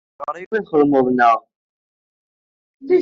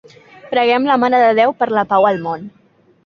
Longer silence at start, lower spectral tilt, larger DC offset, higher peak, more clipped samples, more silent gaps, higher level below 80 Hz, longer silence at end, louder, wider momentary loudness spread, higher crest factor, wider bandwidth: second, 0.2 s vs 0.45 s; second, -5 dB/octave vs -6.5 dB/octave; neither; second, -4 dBFS vs 0 dBFS; neither; first, 0.46-0.51 s, 1.56-2.80 s vs none; about the same, -62 dBFS vs -60 dBFS; second, 0 s vs 0.55 s; second, -17 LUFS vs -14 LUFS; first, 13 LU vs 10 LU; about the same, 16 dB vs 16 dB; about the same, 6.6 kHz vs 6.6 kHz